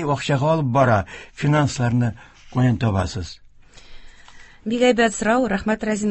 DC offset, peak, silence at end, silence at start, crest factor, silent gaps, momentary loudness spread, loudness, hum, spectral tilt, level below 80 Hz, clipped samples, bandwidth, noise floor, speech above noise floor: under 0.1%; -4 dBFS; 0 s; 0 s; 18 dB; none; 11 LU; -20 LUFS; none; -6 dB/octave; -42 dBFS; under 0.1%; 8.6 kHz; -44 dBFS; 24 dB